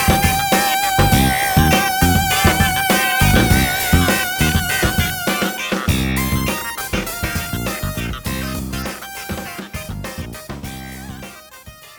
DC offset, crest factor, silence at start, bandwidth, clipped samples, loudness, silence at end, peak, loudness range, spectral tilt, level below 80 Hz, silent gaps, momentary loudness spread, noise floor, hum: under 0.1%; 18 dB; 0 s; over 20 kHz; under 0.1%; -17 LUFS; 0 s; 0 dBFS; 12 LU; -4 dB/octave; -28 dBFS; none; 16 LU; -40 dBFS; none